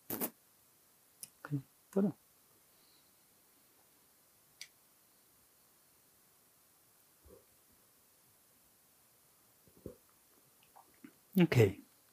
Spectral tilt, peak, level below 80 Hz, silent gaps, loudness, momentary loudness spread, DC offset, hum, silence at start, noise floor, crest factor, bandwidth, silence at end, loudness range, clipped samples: -6.5 dB/octave; -14 dBFS; -76 dBFS; none; -34 LUFS; 30 LU; under 0.1%; none; 0.1 s; -68 dBFS; 28 dB; 15.5 kHz; 0.35 s; 26 LU; under 0.1%